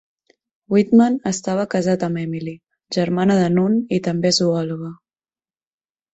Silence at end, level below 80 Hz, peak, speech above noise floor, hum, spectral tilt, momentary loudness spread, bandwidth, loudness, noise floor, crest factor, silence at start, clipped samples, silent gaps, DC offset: 1.2 s; -58 dBFS; -4 dBFS; over 72 dB; none; -5.5 dB/octave; 12 LU; 8.2 kHz; -19 LUFS; under -90 dBFS; 16 dB; 0.7 s; under 0.1%; none; under 0.1%